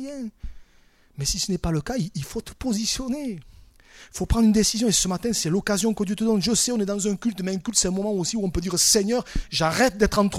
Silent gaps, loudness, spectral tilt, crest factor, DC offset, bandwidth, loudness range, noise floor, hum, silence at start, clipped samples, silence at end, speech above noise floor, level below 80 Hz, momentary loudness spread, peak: none; -23 LUFS; -3.5 dB/octave; 20 dB; under 0.1%; 16 kHz; 6 LU; -57 dBFS; none; 0 s; under 0.1%; 0 s; 33 dB; -38 dBFS; 12 LU; -4 dBFS